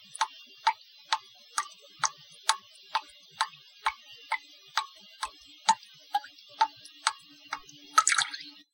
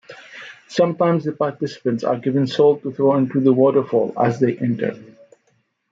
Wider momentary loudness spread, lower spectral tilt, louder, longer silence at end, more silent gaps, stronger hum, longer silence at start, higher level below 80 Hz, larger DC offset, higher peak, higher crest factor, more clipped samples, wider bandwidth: first, 14 LU vs 10 LU; second, 2.5 dB/octave vs -7.5 dB/octave; second, -32 LUFS vs -19 LUFS; second, 0.25 s vs 0.85 s; neither; neither; about the same, 0.2 s vs 0.1 s; second, -76 dBFS vs -66 dBFS; neither; about the same, -2 dBFS vs -4 dBFS; first, 32 dB vs 16 dB; neither; first, 17 kHz vs 7.6 kHz